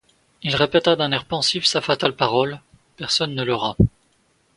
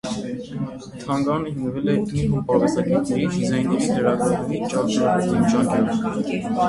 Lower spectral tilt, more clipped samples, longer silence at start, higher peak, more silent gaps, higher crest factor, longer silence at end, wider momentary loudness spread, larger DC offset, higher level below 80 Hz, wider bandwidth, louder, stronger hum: second, -4.5 dB/octave vs -6.5 dB/octave; neither; first, 0.45 s vs 0.05 s; first, 0 dBFS vs -4 dBFS; neither; about the same, 22 dB vs 18 dB; first, 0.7 s vs 0 s; second, 7 LU vs 10 LU; neither; about the same, -42 dBFS vs -46 dBFS; about the same, 11.5 kHz vs 11.5 kHz; about the same, -20 LUFS vs -22 LUFS; neither